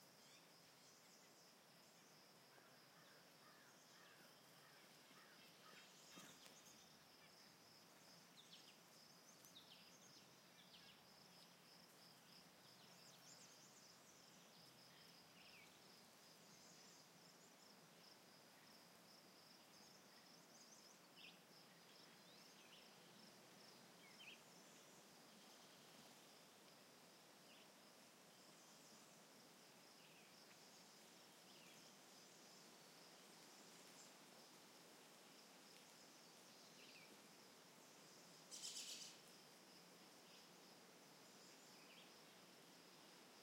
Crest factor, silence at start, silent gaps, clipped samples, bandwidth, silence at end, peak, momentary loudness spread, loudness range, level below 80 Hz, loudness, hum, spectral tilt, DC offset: 28 dB; 0 s; none; under 0.1%; 16 kHz; 0 s; -40 dBFS; 4 LU; 7 LU; under -90 dBFS; -64 LUFS; none; -1.5 dB/octave; under 0.1%